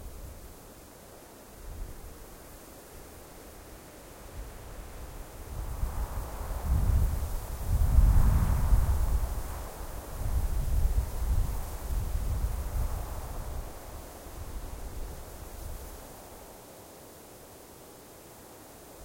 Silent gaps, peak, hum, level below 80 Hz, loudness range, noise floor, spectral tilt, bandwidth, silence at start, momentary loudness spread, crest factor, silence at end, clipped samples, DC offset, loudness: none; -10 dBFS; none; -32 dBFS; 18 LU; -50 dBFS; -6 dB/octave; 16.5 kHz; 0 s; 21 LU; 22 dB; 0 s; under 0.1%; under 0.1%; -33 LUFS